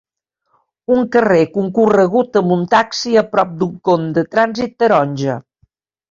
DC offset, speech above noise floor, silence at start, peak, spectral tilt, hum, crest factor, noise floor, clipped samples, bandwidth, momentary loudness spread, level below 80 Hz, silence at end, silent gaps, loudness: under 0.1%; 55 dB; 0.9 s; 0 dBFS; -6 dB/octave; none; 14 dB; -69 dBFS; under 0.1%; 7.6 kHz; 7 LU; -56 dBFS; 0.7 s; none; -15 LUFS